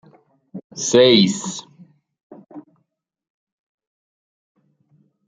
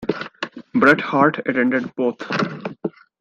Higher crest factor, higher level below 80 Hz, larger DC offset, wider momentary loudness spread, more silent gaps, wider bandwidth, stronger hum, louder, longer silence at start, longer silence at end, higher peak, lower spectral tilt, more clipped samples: about the same, 22 dB vs 20 dB; about the same, -64 dBFS vs -62 dBFS; neither; first, 26 LU vs 15 LU; first, 0.64-0.70 s, 2.23-2.30 s vs none; about the same, 9.6 kHz vs 9 kHz; neither; first, -16 LUFS vs -19 LUFS; first, 0.55 s vs 0 s; first, 2.65 s vs 0.3 s; about the same, 0 dBFS vs -2 dBFS; second, -4 dB/octave vs -6.5 dB/octave; neither